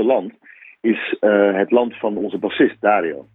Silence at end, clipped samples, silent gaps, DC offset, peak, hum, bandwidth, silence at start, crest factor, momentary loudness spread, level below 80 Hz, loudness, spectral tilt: 0.15 s; under 0.1%; none; under 0.1%; -2 dBFS; none; 4 kHz; 0 s; 16 dB; 8 LU; -62 dBFS; -18 LUFS; -9.5 dB/octave